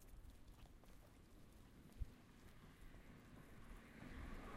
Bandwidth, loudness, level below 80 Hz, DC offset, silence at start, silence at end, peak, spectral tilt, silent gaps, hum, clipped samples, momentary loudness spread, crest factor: 15.5 kHz; -62 LUFS; -62 dBFS; under 0.1%; 0 s; 0 s; -36 dBFS; -5.5 dB/octave; none; none; under 0.1%; 10 LU; 22 dB